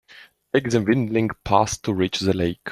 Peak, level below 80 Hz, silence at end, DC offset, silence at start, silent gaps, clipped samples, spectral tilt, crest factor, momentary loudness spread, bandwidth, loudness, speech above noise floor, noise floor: -2 dBFS; -50 dBFS; 0 s; under 0.1%; 0.55 s; none; under 0.1%; -5.5 dB/octave; 20 dB; 4 LU; 13.5 kHz; -22 LUFS; 28 dB; -49 dBFS